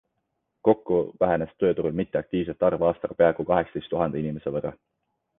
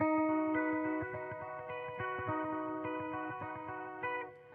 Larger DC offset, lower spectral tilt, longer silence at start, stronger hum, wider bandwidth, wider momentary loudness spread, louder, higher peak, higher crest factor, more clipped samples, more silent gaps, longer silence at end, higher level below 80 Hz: neither; about the same, -10.5 dB/octave vs -9.5 dB/octave; first, 0.65 s vs 0 s; neither; about the same, 3.9 kHz vs 3.6 kHz; second, 7 LU vs 10 LU; first, -25 LUFS vs -38 LUFS; first, -6 dBFS vs -22 dBFS; first, 20 dB vs 14 dB; neither; neither; first, 0.65 s vs 0 s; first, -54 dBFS vs -74 dBFS